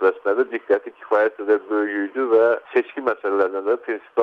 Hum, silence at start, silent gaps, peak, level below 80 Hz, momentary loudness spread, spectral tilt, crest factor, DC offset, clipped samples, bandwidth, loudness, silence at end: none; 0 s; none; -6 dBFS; -72 dBFS; 7 LU; -6.5 dB/octave; 14 dB; under 0.1%; under 0.1%; 5 kHz; -21 LUFS; 0 s